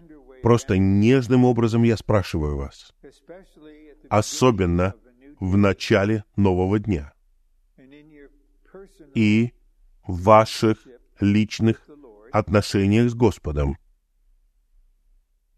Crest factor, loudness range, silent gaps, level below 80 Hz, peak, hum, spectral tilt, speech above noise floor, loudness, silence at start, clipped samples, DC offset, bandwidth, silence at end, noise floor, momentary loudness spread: 20 dB; 5 LU; none; -40 dBFS; -2 dBFS; none; -7 dB/octave; 41 dB; -21 LUFS; 0.1 s; under 0.1%; under 0.1%; 13.5 kHz; 1.8 s; -61 dBFS; 11 LU